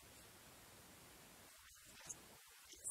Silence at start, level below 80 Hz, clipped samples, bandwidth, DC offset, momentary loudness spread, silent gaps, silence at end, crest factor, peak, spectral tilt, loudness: 0 s; -78 dBFS; under 0.1%; 16 kHz; under 0.1%; 7 LU; none; 0 s; 26 dB; -32 dBFS; -1 dB/octave; -58 LUFS